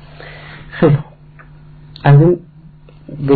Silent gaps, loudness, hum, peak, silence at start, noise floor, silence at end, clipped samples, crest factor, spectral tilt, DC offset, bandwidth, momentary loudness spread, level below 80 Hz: none; -13 LUFS; 50 Hz at -35 dBFS; 0 dBFS; 0.25 s; -40 dBFS; 0 s; under 0.1%; 14 dB; -12.5 dB/octave; under 0.1%; 4.7 kHz; 25 LU; -40 dBFS